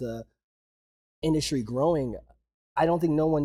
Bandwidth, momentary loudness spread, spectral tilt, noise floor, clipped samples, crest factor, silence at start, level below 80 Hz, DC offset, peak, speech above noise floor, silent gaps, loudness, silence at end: 14.5 kHz; 12 LU; -6.5 dB/octave; under -90 dBFS; under 0.1%; 16 dB; 0 s; -50 dBFS; under 0.1%; -12 dBFS; over 64 dB; 0.44-1.22 s, 2.54-2.75 s; -27 LUFS; 0 s